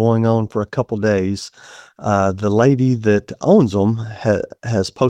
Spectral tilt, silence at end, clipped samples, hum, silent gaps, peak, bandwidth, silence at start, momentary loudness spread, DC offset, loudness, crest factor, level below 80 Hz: -7.5 dB/octave; 0 s; under 0.1%; none; none; 0 dBFS; 10 kHz; 0 s; 8 LU; under 0.1%; -17 LUFS; 16 dB; -50 dBFS